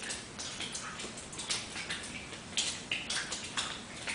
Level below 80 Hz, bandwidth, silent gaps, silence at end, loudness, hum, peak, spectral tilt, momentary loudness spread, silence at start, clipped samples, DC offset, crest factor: -60 dBFS; 10.5 kHz; none; 0 s; -37 LUFS; none; -16 dBFS; -1 dB/octave; 7 LU; 0 s; under 0.1%; under 0.1%; 24 dB